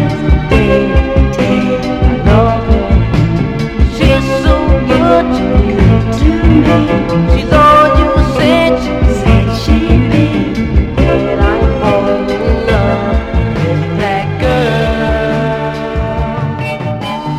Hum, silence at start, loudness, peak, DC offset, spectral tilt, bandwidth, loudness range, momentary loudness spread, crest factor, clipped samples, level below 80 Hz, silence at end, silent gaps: none; 0 s; -11 LUFS; 0 dBFS; under 0.1%; -7.5 dB/octave; 10.5 kHz; 4 LU; 6 LU; 10 dB; 0.4%; -16 dBFS; 0 s; none